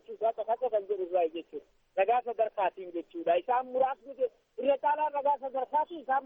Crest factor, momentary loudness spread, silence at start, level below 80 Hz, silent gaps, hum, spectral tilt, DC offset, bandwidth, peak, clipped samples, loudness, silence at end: 18 dB; 8 LU; 0.1 s; -76 dBFS; none; none; -6.5 dB/octave; under 0.1%; 3.8 kHz; -14 dBFS; under 0.1%; -31 LUFS; 0 s